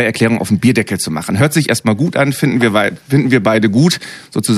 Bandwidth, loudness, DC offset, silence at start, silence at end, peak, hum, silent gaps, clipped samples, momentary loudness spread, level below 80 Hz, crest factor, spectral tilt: 15 kHz; -13 LUFS; under 0.1%; 0 s; 0 s; 0 dBFS; none; none; under 0.1%; 6 LU; -50 dBFS; 14 dB; -5.5 dB/octave